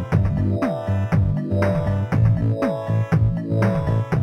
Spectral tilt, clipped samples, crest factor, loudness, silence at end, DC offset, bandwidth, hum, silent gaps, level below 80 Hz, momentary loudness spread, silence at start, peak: -9.5 dB/octave; under 0.1%; 14 dB; -21 LUFS; 0 s; under 0.1%; 6.4 kHz; none; none; -34 dBFS; 4 LU; 0 s; -6 dBFS